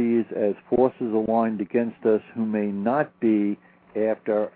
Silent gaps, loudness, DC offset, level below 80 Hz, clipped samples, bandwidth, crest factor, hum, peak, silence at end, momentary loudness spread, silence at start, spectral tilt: none; -24 LUFS; under 0.1%; -62 dBFS; under 0.1%; 4.2 kHz; 16 dB; none; -8 dBFS; 0.05 s; 5 LU; 0 s; -12 dB/octave